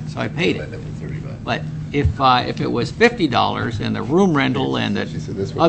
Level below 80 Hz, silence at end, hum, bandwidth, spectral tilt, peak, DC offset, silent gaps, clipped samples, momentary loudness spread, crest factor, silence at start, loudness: -38 dBFS; 0 s; none; 8.6 kHz; -6.5 dB/octave; 0 dBFS; under 0.1%; none; under 0.1%; 12 LU; 18 dB; 0 s; -19 LUFS